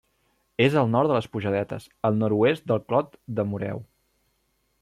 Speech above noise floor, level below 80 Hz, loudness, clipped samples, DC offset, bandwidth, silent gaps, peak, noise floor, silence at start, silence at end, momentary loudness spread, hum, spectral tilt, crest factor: 47 dB; -62 dBFS; -25 LUFS; under 0.1%; under 0.1%; 13 kHz; none; -8 dBFS; -71 dBFS; 0.6 s; 1 s; 11 LU; none; -8 dB/octave; 18 dB